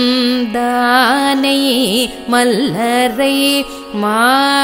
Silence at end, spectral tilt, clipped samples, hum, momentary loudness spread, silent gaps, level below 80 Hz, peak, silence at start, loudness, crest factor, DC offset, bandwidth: 0 s; -3 dB/octave; under 0.1%; none; 5 LU; none; -48 dBFS; 0 dBFS; 0 s; -13 LUFS; 12 dB; under 0.1%; 16.5 kHz